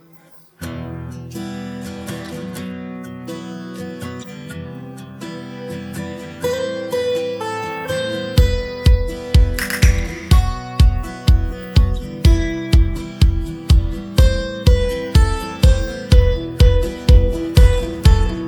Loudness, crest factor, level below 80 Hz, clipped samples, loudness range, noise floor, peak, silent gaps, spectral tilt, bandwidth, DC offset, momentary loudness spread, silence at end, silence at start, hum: -18 LUFS; 16 dB; -18 dBFS; under 0.1%; 14 LU; -46 dBFS; 0 dBFS; none; -6 dB/octave; 19.5 kHz; under 0.1%; 16 LU; 0 s; 0.6 s; none